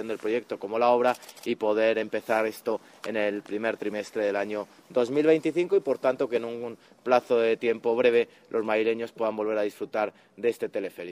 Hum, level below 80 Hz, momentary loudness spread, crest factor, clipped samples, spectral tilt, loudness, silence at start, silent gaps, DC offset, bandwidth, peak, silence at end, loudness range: none; -76 dBFS; 10 LU; 20 dB; under 0.1%; -5.5 dB/octave; -27 LUFS; 0 s; none; under 0.1%; 15.5 kHz; -6 dBFS; 0 s; 3 LU